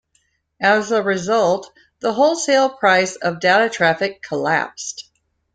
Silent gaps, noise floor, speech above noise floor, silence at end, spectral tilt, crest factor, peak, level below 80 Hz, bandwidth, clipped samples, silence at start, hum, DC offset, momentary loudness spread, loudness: none; -65 dBFS; 47 dB; 0.55 s; -3.5 dB/octave; 16 dB; -2 dBFS; -62 dBFS; 9.4 kHz; under 0.1%; 0.6 s; none; under 0.1%; 10 LU; -18 LUFS